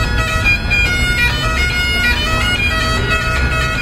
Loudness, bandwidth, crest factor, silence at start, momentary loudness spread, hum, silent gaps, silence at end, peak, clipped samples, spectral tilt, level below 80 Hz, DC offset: -14 LUFS; 16 kHz; 14 dB; 0 s; 3 LU; none; none; 0 s; -2 dBFS; under 0.1%; -3.5 dB/octave; -20 dBFS; under 0.1%